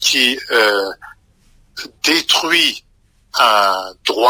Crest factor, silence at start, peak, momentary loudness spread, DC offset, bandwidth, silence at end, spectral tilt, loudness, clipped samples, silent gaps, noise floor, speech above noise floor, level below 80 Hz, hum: 16 dB; 0 s; 0 dBFS; 19 LU; under 0.1%; 16 kHz; 0 s; 0 dB/octave; -14 LUFS; under 0.1%; none; -52 dBFS; 37 dB; -56 dBFS; none